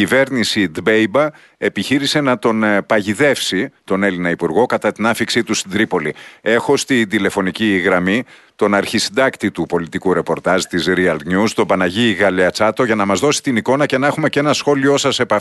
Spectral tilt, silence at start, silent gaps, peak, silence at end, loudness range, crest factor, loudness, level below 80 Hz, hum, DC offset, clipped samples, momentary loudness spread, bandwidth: -4.5 dB/octave; 0 s; none; -2 dBFS; 0 s; 2 LU; 14 dB; -16 LUFS; -54 dBFS; none; under 0.1%; under 0.1%; 5 LU; 12.5 kHz